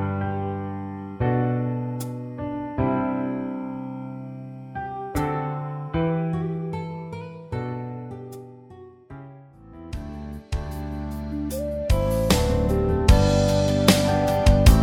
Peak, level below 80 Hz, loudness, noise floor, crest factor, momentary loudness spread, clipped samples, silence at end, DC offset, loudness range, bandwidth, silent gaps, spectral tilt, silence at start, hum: 0 dBFS; -30 dBFS; -24 LUFS; -46 dBFS; 22 dB; 18 LU; under 0.1%; 0 s; under 0.1%; 15 LU; 16 kHz; none; -6 dB/octave; 0 s; none